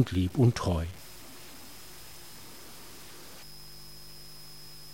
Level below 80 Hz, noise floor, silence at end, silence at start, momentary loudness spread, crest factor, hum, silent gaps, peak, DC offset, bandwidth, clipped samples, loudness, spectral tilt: -50 dBFS; -49 dBFS; 0 s; 0 s; 21 LU; 22 dB; 50 Hz at -60 dBFS; none; -12 dBFS; 0.4%; 16 kHz; under 0.1%; -28 LUFS; -6.5 dB/octave